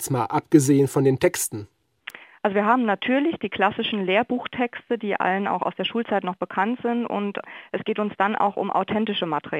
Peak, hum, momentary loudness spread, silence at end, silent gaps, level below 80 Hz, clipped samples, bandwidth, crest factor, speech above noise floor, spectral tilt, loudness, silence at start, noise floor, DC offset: -2 dBFS; none; 9 LU; 0 s; none; -64 dBFS; under 0.1%; 16 kHz; 20 dB; 20 dB; -5 dB/octave; -23 LUFS; 0 s; -43 dBFS; under 0.1%